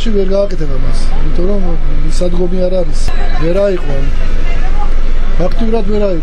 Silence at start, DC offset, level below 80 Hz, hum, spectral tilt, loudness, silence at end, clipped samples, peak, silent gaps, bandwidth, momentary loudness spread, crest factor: 0 s; under 0.1%; -10 dBFS; none; -6.5 dB/octave; -17 LUFS; 0 s; under 0.1%; -2 dBFS; none; 8.2 kHz; 5 LU; 6 dB